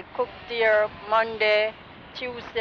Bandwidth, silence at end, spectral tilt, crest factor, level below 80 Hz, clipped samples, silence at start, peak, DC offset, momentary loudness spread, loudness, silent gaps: 6.6 kHz; 0 s; -4.5 dB/octave; 14 dB; -58 dBFS; under 0.1%; 0 s; -10 dBFS; under 0.1%; 13 LU; -24 LUFS; none